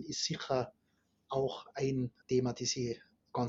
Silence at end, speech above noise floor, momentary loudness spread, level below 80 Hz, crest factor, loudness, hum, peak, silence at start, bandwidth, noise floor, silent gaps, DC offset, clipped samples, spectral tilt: 0 s; 41 dB; 7 LU; -68 dBFS; 16 dB; -36 LUFS; none; -20 dBFS; 0 s; 7.8 kHz; -76 dBFS; none; under 0.1%; under 0.1%; -5 dB/octave